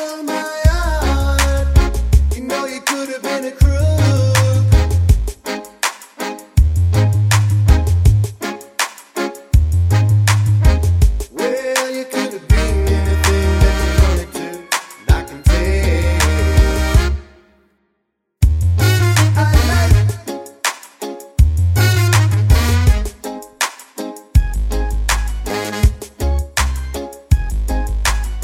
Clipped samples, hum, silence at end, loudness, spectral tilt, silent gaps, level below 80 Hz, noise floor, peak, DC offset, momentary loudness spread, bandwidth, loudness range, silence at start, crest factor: under 0.1%; none; 0 s; -16 LUFS; -5 dB/octave; none; -18 dBFS; -70 dBFS; 0 dBFS; under 0.1%; 11 LU; 16.5 kHz; 4 LU; 0 s; 14 dB